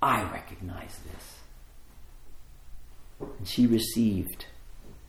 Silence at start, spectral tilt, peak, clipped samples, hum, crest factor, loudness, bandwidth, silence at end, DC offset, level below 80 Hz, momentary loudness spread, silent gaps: 0 s; -5 dB/octave; -10 dBFS; under 0.1%; none; 20 dB; -28 LUFS; 16.5 kHz; 0 s; under 0.1%; -48 dBFS; 22 LU; none